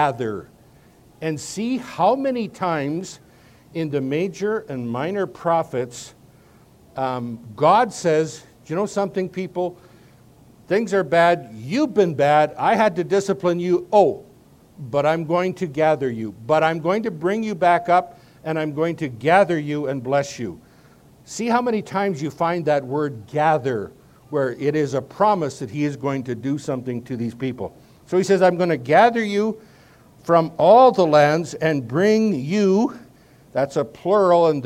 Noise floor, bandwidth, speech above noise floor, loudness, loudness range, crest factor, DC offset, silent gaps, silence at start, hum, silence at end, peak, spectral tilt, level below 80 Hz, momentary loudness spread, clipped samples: -51 dBFS; 15.5 kHz; 31 dB; -20 LUFS; 8 LU; 20 dB; under 0.1%; none; 0 s; none; 0 s; -2 dBFS; -6 dB/octave; -62 dBFS; 12 LU; under 0.1%